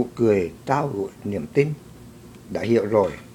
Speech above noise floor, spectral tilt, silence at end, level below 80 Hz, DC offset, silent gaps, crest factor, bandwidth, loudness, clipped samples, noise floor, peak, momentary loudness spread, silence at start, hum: 21 dB; -7.5 dB/octave; 0 s; -54 dBFS; under 0.1%; none; 20 dB; 17 kHz; -23 LUFS; under 0.1%; -44 dBFS; -4 dBFS; 10 LU; 0 s; none